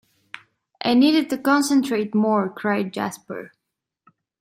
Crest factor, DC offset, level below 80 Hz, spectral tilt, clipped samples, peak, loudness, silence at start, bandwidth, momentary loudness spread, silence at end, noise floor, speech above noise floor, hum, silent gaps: 16 dB; under 0.1%; -68 dBFS; -4.5 dB/octave; under 0.1%; -6 dBFS; -20 LUFS; 0.8 s; 16 kHz; 23 LU; 0.95 s; -82 dBFS; 62 dB; none; none